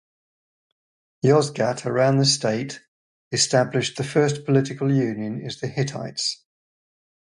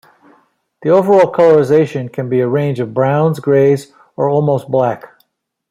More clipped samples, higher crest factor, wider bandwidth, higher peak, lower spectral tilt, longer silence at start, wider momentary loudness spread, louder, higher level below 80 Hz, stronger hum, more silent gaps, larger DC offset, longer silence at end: neither; first, 20 dB vs 12 dB; second, 11.5 kHz vs 14 kHz; about the same, -4 dBFS vs -2 dBFS; second, -4.5 dB/octave vs -8 dB/octave; first, 1.25 s vs 0.8 s; about the same, 11 LU vs 10 LU; second, -22 LUFS vs -13 LUFS; about the same, -62 dBFS vs -58 dBFS; neither; first, 2.88-3.31 s vs none; neither; first, 0.85 s vs 0.7 s